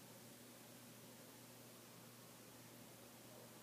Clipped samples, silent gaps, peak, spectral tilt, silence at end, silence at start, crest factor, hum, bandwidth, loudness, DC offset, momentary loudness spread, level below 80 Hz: under 0.1%; none; -48 dBFS; -3.5 dB/octave; 0 s; 0 s; 14 dB; none; 15.5 kHz; -59 LUFS; under 0.1%; 0 LU; under -90 dBFS